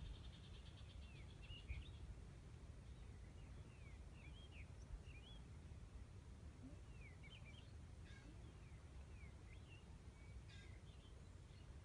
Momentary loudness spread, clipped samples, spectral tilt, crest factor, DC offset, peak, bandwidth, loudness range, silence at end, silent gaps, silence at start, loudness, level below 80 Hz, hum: 3 LU; under 0.1%; -5.5 dB/octave; 18 dB; under 0.1%; -40 dBFS; 10.5 kHz; 2 LU; 0 s; none; 0 s; -60 LUFS; -60 dBFS; none